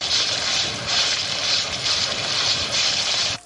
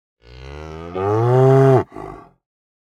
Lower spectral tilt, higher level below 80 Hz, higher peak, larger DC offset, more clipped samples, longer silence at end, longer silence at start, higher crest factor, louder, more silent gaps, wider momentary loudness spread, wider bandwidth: second, 0 dB/octave vs -9 dB/octave; second, -54 dBFS vs -46 dBFS; second, -8 dBFS vs -2 dBFS; neither; neither; second, 0.05 s vs 0.7 s; second, 0 s vs 0.4 s; about the same, 14 dB vs 16 dB; second, -19 LUFS vs -15 LUFS; neither; second, 2 LU vs 23 LU; first, 11.5 kHz vs 7.2 kHz